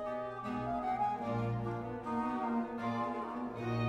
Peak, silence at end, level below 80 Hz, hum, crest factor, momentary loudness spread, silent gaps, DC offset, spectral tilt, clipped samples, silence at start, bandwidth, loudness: -24 dBFS; 0 s; -60 dBFS; none; 12 dB; 5 LU; none; under 0.1%; -8 dB/octave; under 0.1%; 0 s; 9.6 kHz; -37 LUFS